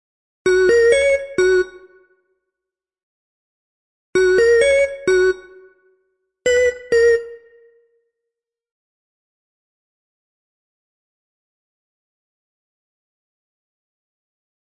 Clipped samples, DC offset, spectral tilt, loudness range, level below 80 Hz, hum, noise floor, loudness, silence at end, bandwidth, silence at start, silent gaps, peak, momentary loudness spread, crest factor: under 0.1%; under 0.1%; -3.5 dB/octave; 5 LU; -50 dBFS; none; -86 dBFS; -16 LUFS; 7.4 s; 11 kHz; 0.45 s; 3.03-4.13 s; -4 dBFS; 10 LU; 18 dB